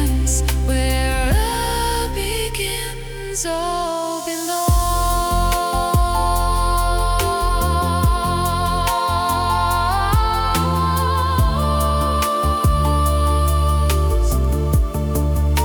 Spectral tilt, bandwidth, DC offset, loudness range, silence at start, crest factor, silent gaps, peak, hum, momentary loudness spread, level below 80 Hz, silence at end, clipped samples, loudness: -4.5 dB/octave; over 20 kHz; under 0.1%; 3 LU; 0 s; 12 dB; none; -6 dBFS; none; 4 LU; -22 dBFS; 0 s; under 0.1%; -19 LUFS